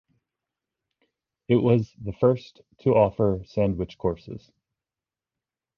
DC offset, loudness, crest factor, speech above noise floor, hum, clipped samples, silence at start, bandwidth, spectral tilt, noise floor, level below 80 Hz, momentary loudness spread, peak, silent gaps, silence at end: under 0.1%; -24 LUFS; 20 dB; over 66 dB; none; under 0.1%; 1.5 s; 6.8 kHz; -9.5 dB/octave; under -90 dBFS; -50 dBFS; 14 LU; -6 dBFS; none; 1.4 s